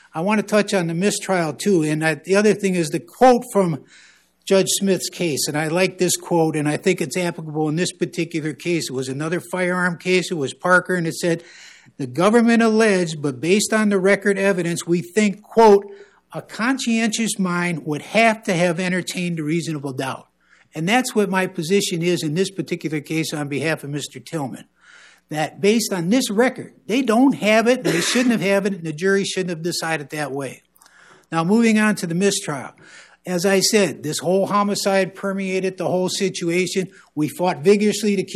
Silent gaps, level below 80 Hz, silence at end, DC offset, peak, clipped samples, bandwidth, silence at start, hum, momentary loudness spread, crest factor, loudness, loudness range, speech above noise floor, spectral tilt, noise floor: none; -64 dBFS; 0 s; under 0.1%; -4 dBFS; under 0.1%; 14.5 kHz; 0.15 s; none; 10 LU; 16 dB; -20 LUFS; 4 LU; 31 dB; -4.5 dB/octave; -50 dBFS